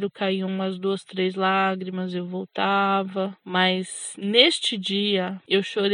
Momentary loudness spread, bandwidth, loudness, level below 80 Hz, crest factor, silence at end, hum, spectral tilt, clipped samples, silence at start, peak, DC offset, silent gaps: 11 LU; 11 kHz; -23 LUFS; -80 dBFS; 22 dB; 0 s; none; -4 dB/octave; under 0.1%; 0 s; -2 dBFS; under 0.1%; none